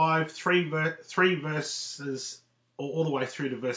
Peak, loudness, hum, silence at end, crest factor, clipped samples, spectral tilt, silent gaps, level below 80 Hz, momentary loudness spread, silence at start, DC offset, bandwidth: -10 dBFS; -29 LUFS; none; 0 s; 20 dB; under 0.1%; -4.5 dB/octave; none; -80 dBFS; 11 LU; 0 s; under 0.1%; 8 kHz